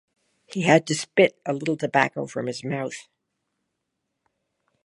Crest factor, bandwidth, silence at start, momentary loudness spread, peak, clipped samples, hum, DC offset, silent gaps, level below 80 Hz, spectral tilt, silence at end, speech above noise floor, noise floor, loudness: 24 dB; 11.5 kHz; 0.5 s; 12 LU; -2 dBFS; under 0.1%; none; under 0.1%; none; -70 dBFS; -5 dB/octave; 1.85 s; 57 dB; -80 dBFS; -23 LUFS